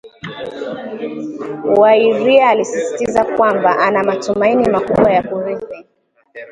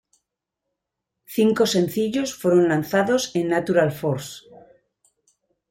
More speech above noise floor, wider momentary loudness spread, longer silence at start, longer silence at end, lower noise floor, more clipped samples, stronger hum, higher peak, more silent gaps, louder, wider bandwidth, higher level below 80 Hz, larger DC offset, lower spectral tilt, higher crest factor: second, 27 dB vs 62 dB; first, 16 LU vs 10 LU; second, 0.05 s vs 1.3 s; second, 0 s vs 1.3 s; second, -41 dBFS vs -82 dBFS; neither; neither; first, 0 dBFS vs -6 dBFS; neither; first, -14 LUFS vs -21 LUFS; second, 10.5 kHz vs 16.5 kHz; first, -50 dBFS vs -62 dBFS; neither; about the same, -5 dB/octave vs -5 dB/octave; about the same, 14 dB vs 16 dB